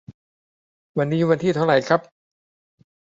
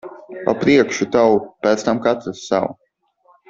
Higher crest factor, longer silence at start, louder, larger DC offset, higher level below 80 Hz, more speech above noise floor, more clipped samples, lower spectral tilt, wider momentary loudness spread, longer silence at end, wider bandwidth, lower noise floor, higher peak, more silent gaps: about the same, 20 dB vs 18 dB; about the same, 0.1 s vs 0.05 s; second, -21 LUFS vs -18 LUFS; neither; second, -64 dBFS vs -56 dBFS; first, over 71 dB vs 41 dB; neither; first, -7 dB/octave vs -5 dB/octave; second, 7 LU vs 10 LU; first, 1.15 s vs 0.75 s; about the same, 7.8 kHz vs 7.8 kHz; first, under -90 dBFS vs -58 dBFS; about the same, -2 dBFS vs -2 dBFS; first, 0.14-0.95 s vs none